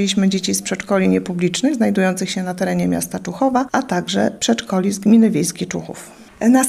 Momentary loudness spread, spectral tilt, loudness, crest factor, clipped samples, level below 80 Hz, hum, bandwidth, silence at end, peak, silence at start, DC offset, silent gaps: 8 LU; -5 dB/octave; -18 LUFS; 16 dB; under 0.1%; -54 dBFS; none; 15 kHz; 0 s; 0 dBFS; 0 s; under 0.1%; none